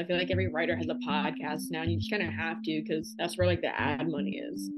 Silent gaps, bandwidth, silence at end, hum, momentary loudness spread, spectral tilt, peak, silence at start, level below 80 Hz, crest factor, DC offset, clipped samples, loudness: none; 12.5 kHz; 0 s; none; 6 LU; -6 dB/octave; -14 dBFS; 0 s; -50 dBFS; 16 dB; under 0.1%; under 0.1%; -31 LUFS